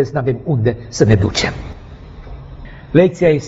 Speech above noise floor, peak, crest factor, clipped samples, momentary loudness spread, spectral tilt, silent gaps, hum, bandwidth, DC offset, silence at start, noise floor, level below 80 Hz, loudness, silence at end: 20 dB; 0 dBFS; 16 dB; under 0.1%; 23 LU; -6 dB/octave; none; none; 8 kHz; under 0.1%; 0 s; -34 dBFS; -34 dBFS; -15 LUFS; 0 s